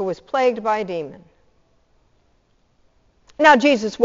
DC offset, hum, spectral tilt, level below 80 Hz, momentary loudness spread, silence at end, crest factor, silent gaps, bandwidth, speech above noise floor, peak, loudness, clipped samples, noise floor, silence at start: under 0.1%; none; -2 dB/octave; -60 dBFS; 16 LU; 0 s; 20 dB; none; 7.6 kHz; 44 dB; 0 dBFS; -18 LUFS; under 0.1%; -61 dBFS; 0 s